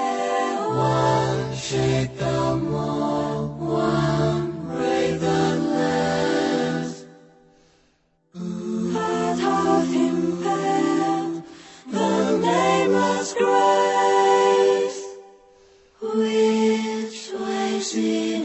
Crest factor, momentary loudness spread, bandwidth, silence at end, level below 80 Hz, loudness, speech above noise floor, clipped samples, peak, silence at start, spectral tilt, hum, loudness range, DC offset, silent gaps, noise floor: 16 dB; 10 LU; 8.4 kHz; 0 s; -52 dBFS; -22 LUFS; 42 dB; under 0.1%; -6 dBFS; 0 s; -5.5 dB/octave; none; 6 LU; under 0.1%; none; -64 dBFS